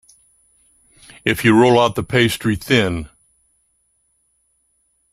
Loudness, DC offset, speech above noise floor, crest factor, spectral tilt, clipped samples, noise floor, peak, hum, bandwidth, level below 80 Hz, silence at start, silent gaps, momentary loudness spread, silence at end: -16 LUFS; under 0.1%; 49 dB; 18 dB; -5.5 dB/octave; under 0.1%; -65 dBFS; -2 dBFS; none; 16 kHz; -48 dBFS; 1.25 s; none; 11 LU; 2.05 s